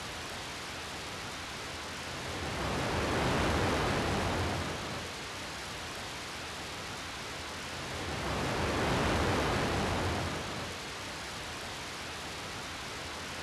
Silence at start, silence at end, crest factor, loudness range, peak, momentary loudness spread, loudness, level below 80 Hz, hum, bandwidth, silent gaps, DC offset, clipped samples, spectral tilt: 0 s; 0 s; 16 dB; 6 LU; -20 dBFS; 9 LU; -35 LUFS; -46 dBFS; none; 15.5 kHz; none; under 0.1%; under 0.1%; -4 dB/octave